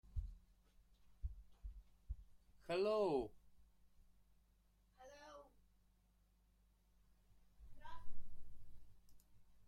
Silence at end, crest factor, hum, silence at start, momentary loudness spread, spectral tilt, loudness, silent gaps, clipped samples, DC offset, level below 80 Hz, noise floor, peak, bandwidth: 0.05 s; 18 dB; 50 Hz at -75 dBFS; 0.1 s; 26 LU; -6.5 dB/octave; -44 LUFS; none; under 0.1%; under 0.1%; -58 dBFS; -76 dBFS; -28 dBFS; 10.5 kHz